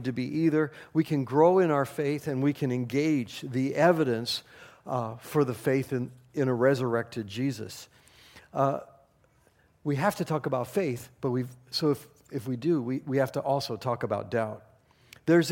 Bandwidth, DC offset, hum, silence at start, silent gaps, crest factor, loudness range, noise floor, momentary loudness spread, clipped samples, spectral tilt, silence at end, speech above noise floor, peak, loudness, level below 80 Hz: 17 kHz; under 0.1%; none; 0 s; none; 20 dB; 6 LU; -64 dBFS; 11 LU; under 0.1%; -6.5 dB/octave; 0 s; 37 dB; -8 dBFS; -28 LUFS; -68 dBFS